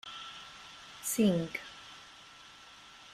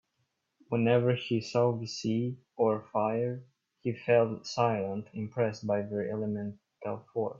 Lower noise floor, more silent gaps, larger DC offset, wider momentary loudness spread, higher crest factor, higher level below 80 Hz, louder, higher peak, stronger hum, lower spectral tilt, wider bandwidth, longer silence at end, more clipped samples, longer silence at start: second, -54 dBFS vs -79 dBFS; neither; neither; first, 23 LU vs 11 LU; about the same, 20 dB vs 18 dB; about the same, -70 dBFS vs -72 dBFS; about the same, -33 LUFS vs -31 LUFS; second, -16 dBFS vs -12 dBFS; neither; second, -4.5 dB/octave vs -6.5 dB/octave; first, 16 kHz vs 7.6 kHz; about the same, 0 s vs 0 s; neither; second, 0.05 s vs 0.7 s